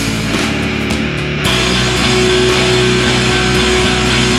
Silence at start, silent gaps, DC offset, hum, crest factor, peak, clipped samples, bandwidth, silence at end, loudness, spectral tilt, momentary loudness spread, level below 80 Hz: 0 s; none; under 0.1%; none; 12 dB; 0 dBFS; under 0.1%; 15 kHz; 0 s; -12 LUFS; -4 dB/octave; 5 LU; -26 dBFS